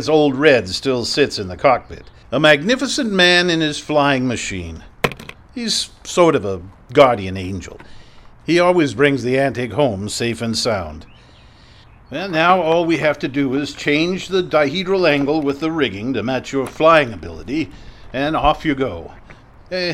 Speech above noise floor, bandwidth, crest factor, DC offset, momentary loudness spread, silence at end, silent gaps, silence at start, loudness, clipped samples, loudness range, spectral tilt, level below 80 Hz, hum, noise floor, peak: 28 dB; 15.5 kHz; 18 dB; under 0.1%; 14 LU; 0 s; none; 0 s; -17 LUFS; under 0.1%; 4 LU; -4.5 dB/octave; -42 dBFS; none; -45 dBFS; 0 dBFS